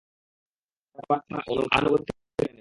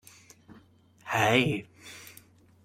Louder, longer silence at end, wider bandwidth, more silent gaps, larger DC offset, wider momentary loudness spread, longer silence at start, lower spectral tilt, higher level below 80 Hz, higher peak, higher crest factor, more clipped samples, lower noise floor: about the same, -26 LUFS vs -26 LUFS; second, 0.1 s vs 0.55 s; second, 11.5 kHz vs 16 kHz; neither; neither; second, 10 LU vs 24 LU; about the same, 1 s vs 1.05 s; first, -6 dB/octave vs -4.5 dB/octave; first, -54 dBFS vs -64 dBFS; about the same, -6 dBFS vs -8 dBFS; about the same, 22 dB vs 24 dB; neither; first, -71 dBFS vs -59 dBFS